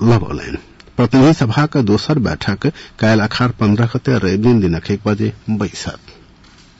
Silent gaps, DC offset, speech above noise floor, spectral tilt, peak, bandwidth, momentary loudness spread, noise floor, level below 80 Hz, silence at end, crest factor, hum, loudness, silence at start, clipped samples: none; under 0.1%; 30 dB; -7 dB/octave; -4 dBFS; 8 kHz; 14 LU; -45 dBFS; -40 dBFS; 0.7 s; 10 dB; none; -15 LUFS; 0 s; under 0.1%